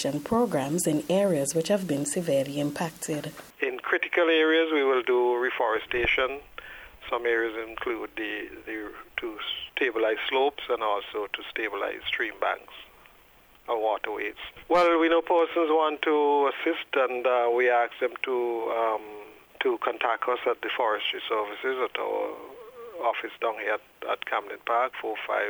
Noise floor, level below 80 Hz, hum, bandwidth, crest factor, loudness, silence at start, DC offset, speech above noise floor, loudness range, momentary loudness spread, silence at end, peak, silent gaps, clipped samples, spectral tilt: -56 dBFS; -60 dBFS; none; over 20 kHz; 18 dB; -27 LUFS; 0 s; under 0.1%; 30 dB; 6 LU; 12 LU; 0 s; -10 dBFS; none; under 0.1%; -4 dB/octave